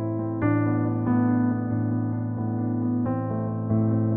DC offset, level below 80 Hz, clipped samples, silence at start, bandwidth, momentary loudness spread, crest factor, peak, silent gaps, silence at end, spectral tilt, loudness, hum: under 0.1%; -54 dBFS; under 0.1%; 0 s; 2.5 kHz; 5 LU; 12 dB; -12 dBFS; none; 0 s; -12 dB/octave; -25 LUFS; none